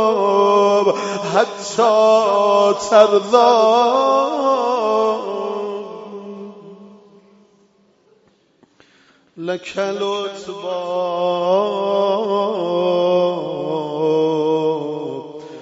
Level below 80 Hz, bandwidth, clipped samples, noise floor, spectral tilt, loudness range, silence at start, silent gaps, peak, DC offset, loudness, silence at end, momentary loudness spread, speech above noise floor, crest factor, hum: -68 dBFS; 8 kHz; under 0.1%; -57 dBFS; -4.5 dB/octave; 16 LU; 0 s; none; 0 dBFS; under 0.1%; -17 LUFS; 0 s; 15 LU; 41 dB; 18 dB; none